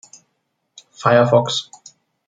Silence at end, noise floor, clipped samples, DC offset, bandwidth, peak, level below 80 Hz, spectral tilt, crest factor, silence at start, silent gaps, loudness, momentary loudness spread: 0.65 s; -72 dBFS; under 0.1%; under 0.1%; 9.4 kHz; -2 dBFS; -64 dBFS; -5 dB/octave; 18 dB; 1 s; none; -16 LUFS; 12 LU